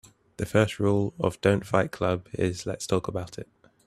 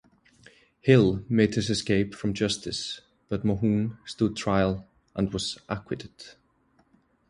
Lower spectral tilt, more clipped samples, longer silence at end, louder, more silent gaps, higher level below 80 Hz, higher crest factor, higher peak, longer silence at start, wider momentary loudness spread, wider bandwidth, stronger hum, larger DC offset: about the same, -6 dB/octave vs -6 dB/octave; neither; second, 0.45 s vs 1 s; about the same, -27 LUFS vs -27 LUFS; neither; about the same, -54 dBFS vs -50 dBFS; about the same, 20 dB vs 22 dB; about the same, -6 dBFS vs -6 dBFS; second, 0.4 s vs 0.85 s; second, 11 LU vs 15 LU; first, 13.5 kHz vs 11.5 kHz; neither; neither